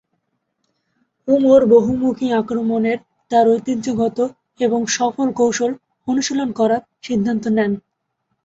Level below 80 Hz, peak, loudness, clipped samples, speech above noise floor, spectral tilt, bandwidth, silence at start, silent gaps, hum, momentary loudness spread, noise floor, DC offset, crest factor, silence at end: -56 dBFS; -2 dBFS; -18 LUFS; under 0.1%; 56 dB; -5 dB/octave; 8 kHz; 1.25 s; none; none; 10 LU; -72 dBFS; under 0.1%; 16 dB; 0.65 s